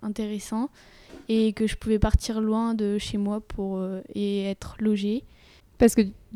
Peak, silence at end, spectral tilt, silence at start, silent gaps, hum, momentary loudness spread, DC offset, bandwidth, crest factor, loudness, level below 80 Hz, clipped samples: -6 dBFS; 0 s; -6 dB/octave; 0 s; none; none; 10 LU; under 0.1%; 15 kHz; 20 dB; -26 LUFS; -36 dBFS; under 0.1%